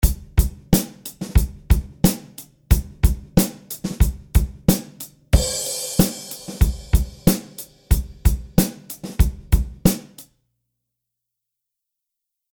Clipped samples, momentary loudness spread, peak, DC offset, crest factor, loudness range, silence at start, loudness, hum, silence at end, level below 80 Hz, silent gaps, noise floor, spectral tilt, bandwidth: under 0.1%; 13 LU; -2 dBFS; under 0.1%; 20 dB; 3 LU; 0 s; -22 LUFS; none; 2.3 s; -24 dBFS; none; -82 dBFS; -5.5 dB/octave; over 20 kHz